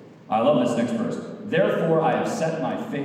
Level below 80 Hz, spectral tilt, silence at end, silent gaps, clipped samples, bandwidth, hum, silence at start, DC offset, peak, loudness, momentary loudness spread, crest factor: -74 dBFS; -6.5 dB/octave; 0 s; none; under 0.1%; 14 kHz; none; 0 s; under 0.1%; -6 dBFS; -23 LUFS; 7 LU; 16 dB